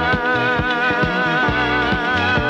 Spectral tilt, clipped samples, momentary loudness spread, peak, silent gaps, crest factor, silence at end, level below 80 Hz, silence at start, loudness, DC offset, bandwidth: -6 dB/octave; under 0.1%; 1 LU; -4 dBFS; none; 14 dB; 0 s; -36 dBFS; 0 s; -17 LUFS; under 0.1%; 9.6 kHz